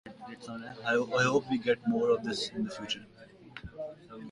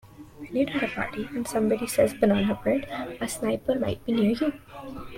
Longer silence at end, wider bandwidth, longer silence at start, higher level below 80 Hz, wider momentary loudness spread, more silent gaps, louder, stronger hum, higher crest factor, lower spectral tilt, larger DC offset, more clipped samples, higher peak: about the same, 0 s vs 0 s; second, 11.5 kHz vs 16.5 kHz; about the same, 0.05 s vs 0.05 s; second, -64 dBFS vs -52 dBFS; first, 19 LU vs 11 LU; neither; second, -30 LUFS vs -26 LUFS; neither; about the same, 20 dB vs 18 dB; about the same, -4.5 dB/octave vs -5.5 dB/octave; neither; neither; second, -12 dBFS vs -8 dBFS